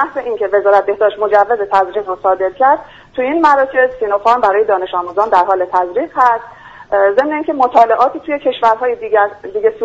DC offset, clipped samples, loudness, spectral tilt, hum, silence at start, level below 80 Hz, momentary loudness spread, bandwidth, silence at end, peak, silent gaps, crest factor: under 0.1%; under 0.1%; -13 LUFS; -5 dB/octave; none; 0 s; -52 dBFS; 7 LU; 7.8 kHz; 0 s; 0 dBFS; none; 14 dB